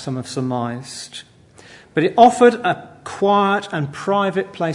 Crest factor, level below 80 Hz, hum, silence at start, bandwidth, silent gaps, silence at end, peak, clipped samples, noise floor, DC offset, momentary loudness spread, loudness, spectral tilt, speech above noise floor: 18 dB; -62 dBFS; none; 0 s; 11 kHz; none; 0 s; 0 dBFS; under 0.1%; -45 dBFS; under 0.1%; 19 LU; -18 LUFS; -5.5 dB/octave; 28 dB